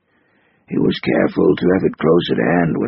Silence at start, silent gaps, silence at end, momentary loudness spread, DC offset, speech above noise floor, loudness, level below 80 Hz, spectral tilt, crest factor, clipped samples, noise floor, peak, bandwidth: 0.7 s; none; 0 s; 4 LU; under 0.1%; 43 dB; -16 LUFS; -48 dBFS; -5.5 dB/octave; 16 dB; under 0.1%; -59 dBFS; -2 dBFS; 5.8 kHz